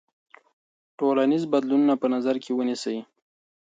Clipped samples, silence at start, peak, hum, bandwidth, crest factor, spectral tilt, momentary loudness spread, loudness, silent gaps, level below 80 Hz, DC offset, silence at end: under 0.1%; 1 s; -10 dBFS; none; 9 kHz; 16 dB; -6 dB/octave; 8 LU; -24 LUFS; none; -78 dBFS; under 0.1%; 0.6 s